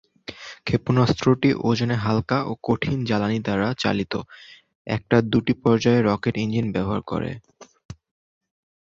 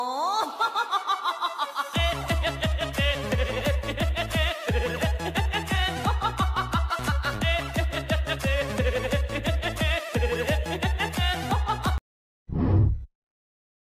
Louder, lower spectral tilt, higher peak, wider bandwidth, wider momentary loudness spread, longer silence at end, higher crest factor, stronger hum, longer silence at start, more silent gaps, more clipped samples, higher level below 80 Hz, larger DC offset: first, -22 LUFS vs -26 LUFS; first, -7 dB/octave vs -5 dB/octave; first, -2 dBFS vs -10 dBFS; second, 7.4 kHz vs 15.5 kHz; first, 13 LU vs 3 LU; about the same, 0.9 s vs 0.9 s; about the same, 20 dB vs 16 dB; neither; first, 0.3 s vs 0 s; second, 4.75-4.85 s, 7.85-7.89 s vs 12.01-12.46 s; neither; second, -50 dBFS vs -32 dBFS; neither